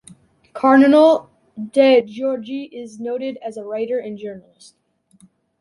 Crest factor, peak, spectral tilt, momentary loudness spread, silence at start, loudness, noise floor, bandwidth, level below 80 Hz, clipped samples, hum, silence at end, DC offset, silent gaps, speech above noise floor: 16 dB; -2 dBFS; -5.5 dB/octave; 21 LU; 0.55 s; -17 LUFS; -54 dBFS; 11 kHz; -70 dBFS; under 0.1%; none; 1.2 s; under 0.1%; none; 37 dB